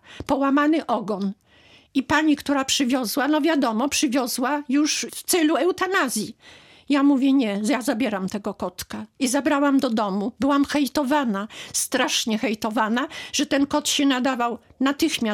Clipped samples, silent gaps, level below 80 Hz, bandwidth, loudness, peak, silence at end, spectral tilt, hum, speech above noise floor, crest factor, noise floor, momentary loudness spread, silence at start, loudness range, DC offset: under 0.1%; none; -58 dBFS; 17 kHz; -22 LUFS; -8 dBFS; 0 s; -3 dB/octave; none; 32 dB; 16 dB; -54 dBFS; 8 LU; 0.1 s; 2 LU; under 0.1%